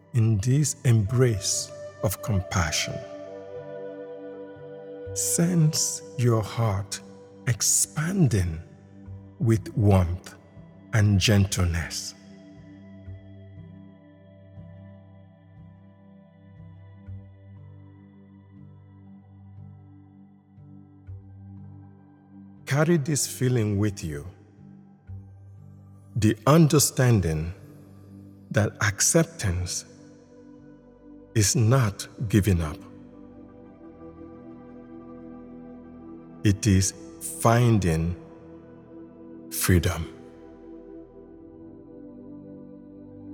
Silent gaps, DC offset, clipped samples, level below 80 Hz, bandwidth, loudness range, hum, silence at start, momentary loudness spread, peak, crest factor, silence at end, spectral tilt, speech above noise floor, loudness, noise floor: none; under 0.1%; under 0.1%; -48 dBFS; 18.5 kHz; 13 LU; none; 0.15 s; 26 LU; -4 dBFS; 24 dB; 0 s; -5 dB/octave; 29 dB; -24 LUFS; -52 dBFS